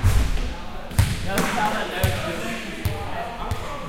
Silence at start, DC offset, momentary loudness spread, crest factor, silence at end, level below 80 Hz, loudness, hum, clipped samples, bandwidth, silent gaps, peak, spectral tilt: 0 s; under 0.1%; 8 LU; 20 dB; 0 s; -28 dBFS; -26 LUFS; none; under 0.1%; 16.5 kHz; none; -4 dBFS; -5 dB/octave